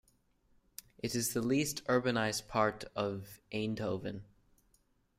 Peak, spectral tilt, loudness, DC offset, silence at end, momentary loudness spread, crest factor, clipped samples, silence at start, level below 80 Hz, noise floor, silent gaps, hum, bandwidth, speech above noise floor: -16 dBFS; -4.5 dB/octave; -35 LUFS; under 0.1%; 0.95 s; 15 LU; 22 dB; under 0.1%; 1.05 s; -64 dBFS; -72 dBFS; none; none; 16 kHz; 38 dB